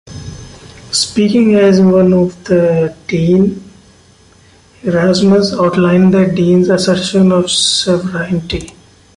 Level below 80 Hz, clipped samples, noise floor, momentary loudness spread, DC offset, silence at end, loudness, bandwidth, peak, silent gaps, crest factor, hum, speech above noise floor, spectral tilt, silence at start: -40 dBFS; under 0.1%; -45 dBFS; 12 LU; under 0.1%; 0.5 s; -11 LUFS; 11.5 kHz; 0 dBFS; none; 12 dB; none; 34 dB; -5.5 dB/octave; 0.05 s